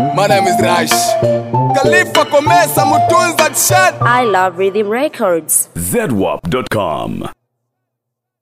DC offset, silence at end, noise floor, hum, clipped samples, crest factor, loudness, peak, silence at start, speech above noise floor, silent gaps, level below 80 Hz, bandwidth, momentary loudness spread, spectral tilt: under 0.1%; 1.1 s; -77 dBFS; none; under 0.1%; 12 dB; -12 LUFS; 0 dBFS; 0 s; 64 dB; none; -46 dBFS; 16 kHz; 7 LU; -3.5 dB/octave